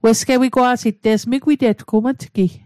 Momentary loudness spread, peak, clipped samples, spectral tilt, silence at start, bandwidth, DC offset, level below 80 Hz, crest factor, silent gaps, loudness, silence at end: 5 LU; -4 dBFS; under 0.1%; -5 dB/octave; 0.05 s; 15 kHz; under 0.1%; -54 dBFS; 12 dB; none; -17 LUFS; 0.1 s